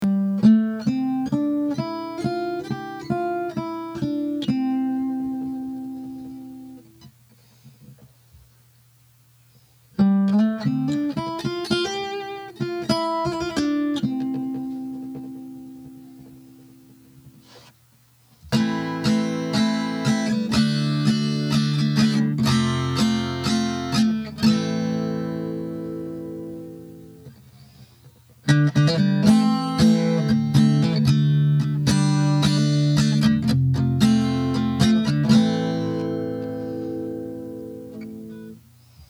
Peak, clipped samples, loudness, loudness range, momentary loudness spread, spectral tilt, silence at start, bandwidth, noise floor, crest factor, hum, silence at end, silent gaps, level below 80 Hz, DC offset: -2 dBFS; under 0.1%; -22 LUFS; 12 LU; 17 LU; -6.5 dB/octave; 0 s; 13.5 kHz; -57 dBFS; 20 dB; none; 0.05 s; none; -50 dBFS; under 0.1%